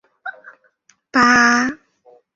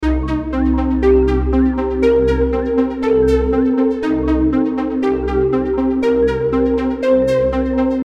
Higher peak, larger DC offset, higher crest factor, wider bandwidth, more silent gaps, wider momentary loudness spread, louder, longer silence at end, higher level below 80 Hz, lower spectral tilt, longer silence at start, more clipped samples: about the same, -2 dBFS vs -2 dBFS; neither; first, 18 dB vs 12 dB; about the same, 7.8 kHz vs 8 kHz; neither; first, 22 LU vs 4 LU; about the same, -14 LUFS vs -16 LUFS; first, 0.6 s vs 0 s; second, -56 dBFS vs -24 dBFS; second, -2.5 dB/octave vs -8.5 dB/octave; first, 0.25 s vs 0 s; neither